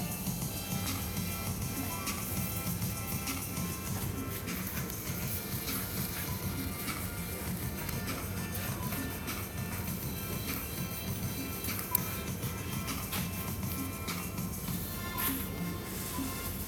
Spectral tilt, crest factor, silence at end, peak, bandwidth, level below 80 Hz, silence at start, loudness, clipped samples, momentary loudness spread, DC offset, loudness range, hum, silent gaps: -4 dB/octave; 26 dB; 0 s; -10 dBFS; over 20 kHz; -48 dBFS; 0 s; -35 LUFS; under 0.1%; 3 LU; under 0.1%; 1 LU; none; none